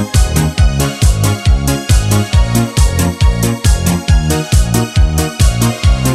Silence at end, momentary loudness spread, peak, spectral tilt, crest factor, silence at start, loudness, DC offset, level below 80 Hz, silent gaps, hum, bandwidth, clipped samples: 0 s; 1 LU; 0 dBFS; -5 dB/octave; 10 dB; 0 s; -13 LUFS; under 0.1%; -14 dBFS; none; none; 15.5 kHz; under 0.1%